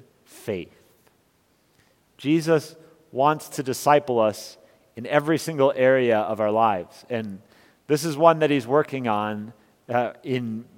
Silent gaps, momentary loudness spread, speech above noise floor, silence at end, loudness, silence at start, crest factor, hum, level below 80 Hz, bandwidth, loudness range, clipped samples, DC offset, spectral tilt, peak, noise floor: none; 18 LU; 42 dB; 0.15 s; -23 LUFS; 0.35 s; 22 dB; none; -70 dBFS; 17 kHz; 5 LU; under 0.1%; under 0.1%; -5.5 dB/octave; -2 dBFS; -64 dBFS